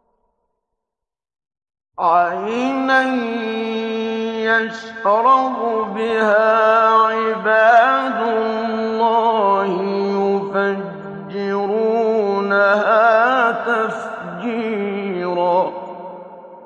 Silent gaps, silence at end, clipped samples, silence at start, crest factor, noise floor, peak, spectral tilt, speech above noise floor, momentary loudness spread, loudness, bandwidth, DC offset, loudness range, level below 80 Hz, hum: none; 0 s; under 0.1%; 2 s; 16 dB; -85 dBFS; -2 dBFS; -6 dB/octave; 69 dB; 11 LU; -17 LUFS; 9.2 kHz; under 0.1%; 5 LU; -68 dBFS; none